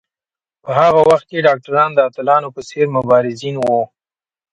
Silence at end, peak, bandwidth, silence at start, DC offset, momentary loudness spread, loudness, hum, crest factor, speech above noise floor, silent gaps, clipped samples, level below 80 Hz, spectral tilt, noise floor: 0.7 s; 0 dBFS; 11 kHz; 0.65 s; under 0.1%; 9 LU; -14 LUFS; none; 16 dB; over 76 dB; none; under 0.1%; -56 dBFS; -6 dB/octave; under -90 dBFS